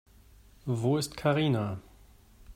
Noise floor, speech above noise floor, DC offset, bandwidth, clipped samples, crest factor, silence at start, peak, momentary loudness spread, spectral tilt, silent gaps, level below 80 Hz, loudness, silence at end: -57 dBFS; 28 dB; under 0.1%; 16 kHz; under 0.1%; 18 dB; 0.65 s; -14 dBFS; 13 LU; -6 dB/octave; none; -58 dBFS; -29 LUFS; 0 s